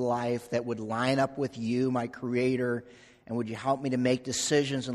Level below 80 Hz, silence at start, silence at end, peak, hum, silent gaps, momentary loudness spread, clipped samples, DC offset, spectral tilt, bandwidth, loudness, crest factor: -66 dBFS; 0 s; 0 s; -12 dBFS; none; none; 6 LU; under 0.1%; under 0.1%; -5 dB/octave; 13 kHz; -30 LUFS; 18 dB